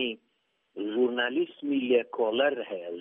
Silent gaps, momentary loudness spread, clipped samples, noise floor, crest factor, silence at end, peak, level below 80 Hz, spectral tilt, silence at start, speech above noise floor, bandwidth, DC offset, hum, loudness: none; 11 LU; under 0.1%; -74 dBFS; 18 dB; 0 s; -12 dBFS; -84 dBFS; -1.5 dB/octave; 0 s; 47 dB; 3.8 kHz; under 0.1%; none; -28 LUFS